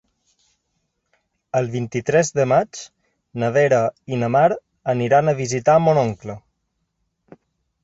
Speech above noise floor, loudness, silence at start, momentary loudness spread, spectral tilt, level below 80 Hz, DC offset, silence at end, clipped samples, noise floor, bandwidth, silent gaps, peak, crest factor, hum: 55 dB; -19 LUFS; 1.55 s; 14 LU; -6 dB/octave; -58 dBFS; under 0.1%; 1.45 s; under 0.1%; -73 dBFS; 8 kHz; none; -4 dBFS; 18 dB; none